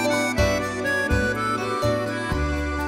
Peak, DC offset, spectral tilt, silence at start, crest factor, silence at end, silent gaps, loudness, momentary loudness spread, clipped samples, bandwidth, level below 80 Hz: -8 dBFS; under 0.1%; -5 dB/octave; 0 s; 16 dB; 0 s; none; -23 LUFS; 4 LU; under 0.1%; 16 kHz; -32 dBFS